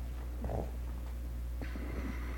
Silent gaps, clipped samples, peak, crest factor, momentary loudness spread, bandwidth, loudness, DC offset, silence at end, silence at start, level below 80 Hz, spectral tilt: none; under 0.1%; -24 dBFS; 16 dB; 4 LU; 17.5 kHz; -41 LUFS; under 0.1%; 0 s; 0 s; -40 dBFS; -7 dB/octave